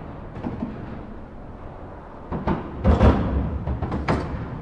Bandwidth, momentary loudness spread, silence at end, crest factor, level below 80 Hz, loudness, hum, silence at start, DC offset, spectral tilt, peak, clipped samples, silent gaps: 7.6 kHz; 21 LU; 0 s; 20 dB; -30 dBFS; -24 LUFS; none; 0 s; under 0.1%; -9 dB/octave; -4 dBFS; under 0.1%; none